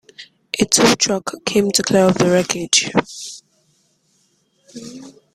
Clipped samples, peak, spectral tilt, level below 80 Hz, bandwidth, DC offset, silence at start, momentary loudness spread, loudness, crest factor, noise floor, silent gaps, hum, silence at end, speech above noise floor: under 0.1%; 0 dBFS; -3 dB/octave; -54 dBFS; 15.5 kHz; under 0.1%; 0.2 s; 22 LU; -16 LUFS; 20 dB; -62 dBFS; none; none; 0.25 s; 46 dB